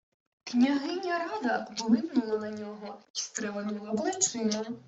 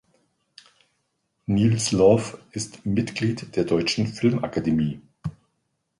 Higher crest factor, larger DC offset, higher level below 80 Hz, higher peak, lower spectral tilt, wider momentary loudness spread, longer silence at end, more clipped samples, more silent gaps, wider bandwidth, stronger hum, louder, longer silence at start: about the same, 20 dB vs 20 dB; neither; second, -76 dBFS vs -52 dBFS; second, -10 dBFS vs -4 dBFS; second, -3 dB/octave vs -5.5 dB/octave; second, 11 LU vs 16 LU; second, 0.05 s vs 0.7 s; neither; first, 3.10-3.14 s vs none; second, 8.2 kHz vs 11.5 kHz; neither; second, -30 LUFS vs -23 LUFS; second, 0.45 s vs 1.5 s